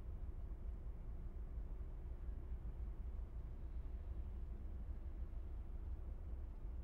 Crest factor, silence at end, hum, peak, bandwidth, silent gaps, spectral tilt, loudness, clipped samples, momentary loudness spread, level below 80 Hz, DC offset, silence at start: 10 dB; 0 s; none; -36 dBFS; 3.4 kHz; none; -9.5 dB/octave; -52 LUFS; under 0.1%; 2 LU; -48 dBFS; under 0.1%; 0 s